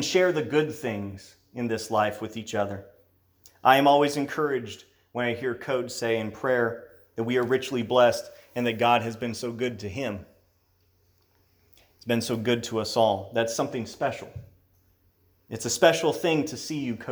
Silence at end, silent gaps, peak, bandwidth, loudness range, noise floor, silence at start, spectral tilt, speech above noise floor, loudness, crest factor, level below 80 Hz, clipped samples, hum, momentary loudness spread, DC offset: 0 s; none; -2 dBFS; over 20 kHz; 5 LU; -66 dBFS; 0 s; -4.5 dB/octave; 41 dB; -26 LUFS; 24 dB; -66 dBFS; under 0.1%; none; 17 LU; under 0.1%